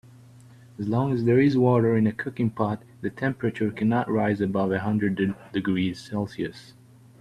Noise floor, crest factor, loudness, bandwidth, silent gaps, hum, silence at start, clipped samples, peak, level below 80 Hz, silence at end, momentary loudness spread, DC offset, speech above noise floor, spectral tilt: -49 dBFS; 18 dB; -25 LUFS; 12 kHz; none; none; 0.8 s; under 0.1%; -8 dBFS; -60 dBFS; 0.6 s; 11 LU; under 0.1%; 26 dB; -8.5 dB/octave